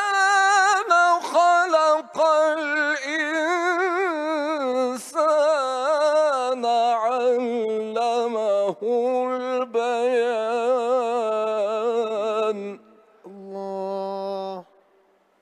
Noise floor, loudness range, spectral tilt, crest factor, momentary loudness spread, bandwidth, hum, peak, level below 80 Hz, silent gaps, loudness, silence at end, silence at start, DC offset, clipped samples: -61 dBFS; 7 LU; -2.5 dB/octave; 16 dB; 11 LU; 13 kHz; none; -6 dBFS; -82 dBFS; none; -22 LUFS; 0.8 s; 0 s; under 0.1%; under 0.1%